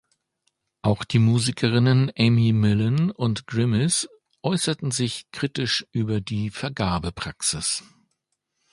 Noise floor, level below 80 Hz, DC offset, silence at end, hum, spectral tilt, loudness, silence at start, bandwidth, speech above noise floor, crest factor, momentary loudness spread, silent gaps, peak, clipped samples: -77 dBFS; -48 dBFS; under 0.1%; 0.9 s; none; -5 dB/octave; -23 LUFS; 0.85 s; 11.5 kHz; 55 dB; 18 dB; 9 LU; none; -4 dBFS; under 0.1%